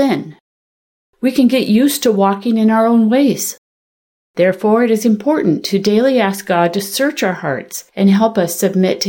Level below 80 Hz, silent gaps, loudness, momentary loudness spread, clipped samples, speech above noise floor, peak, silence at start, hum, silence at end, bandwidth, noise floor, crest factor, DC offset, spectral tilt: -60 dBFS; 0.40-1.13 s, 3.58-4.34 s; -14 LUFS; 9 LU; under 0.1%; over 77 dB; -2 dBFS; 0 s; none; 0 s; 17 kHz; under -90 dBFS; 12 dB; under 0.1%; -5 dB/octave